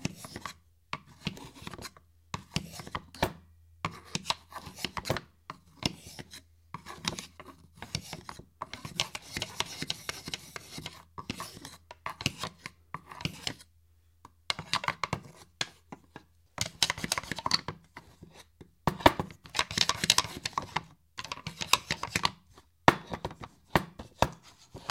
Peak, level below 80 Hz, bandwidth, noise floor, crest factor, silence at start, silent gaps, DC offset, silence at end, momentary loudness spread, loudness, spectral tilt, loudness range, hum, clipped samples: 0 dBFS; -54 dBFS; 16.5 kHz; -65 dBFS; 36 dB; 0 s; none; under 0.1%; 0 s; 22 LU; -33 LUFS; -2.5 dB/octave; 10 LU; none; under 0.1%